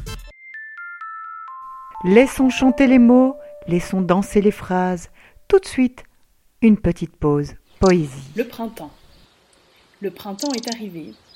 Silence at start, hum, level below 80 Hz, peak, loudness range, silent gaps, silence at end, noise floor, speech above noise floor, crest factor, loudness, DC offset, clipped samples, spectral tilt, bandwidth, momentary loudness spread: 0 s; none; -42 dBFS; 0 dBFS; 8 LU; none; 0.25 s; -57 dBFS; 40 dB; 18 dB; -18 LUFS; under 0.1%; under 0.1%; -6.5 dB/octave; 15.5 kHz; 21 LU